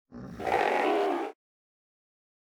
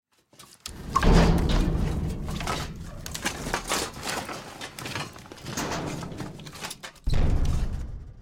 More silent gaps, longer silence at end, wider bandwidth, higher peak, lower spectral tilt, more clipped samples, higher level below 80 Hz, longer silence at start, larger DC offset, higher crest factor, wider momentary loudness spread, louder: neither; first, 1.1 s vs 0 s; first, 19 kHz vs 17 kHz; second, -14 dBFS vs -6 dBFS; about the same, -5 dB/octave vs -5 dB/octave; neither; second, -62 dBFS vs -30 dBFS; second, 0.1 s vs 0.4 s; neither; about the same, 18 dB vs 20 dB; second, 13 LU vs 16 LU; about the same, -28 LUFS vs -29 LUFS